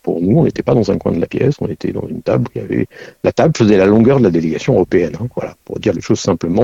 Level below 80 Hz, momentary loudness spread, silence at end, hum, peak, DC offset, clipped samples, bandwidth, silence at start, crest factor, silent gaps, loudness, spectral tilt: -42 dBFS; 12 LU; 0 s; none; 0 dBFS; under 0.1%; under 0.1%; 8 kHz; 0.05 s; 14 dB; none; -15 LUFS; -7.5 dB/octave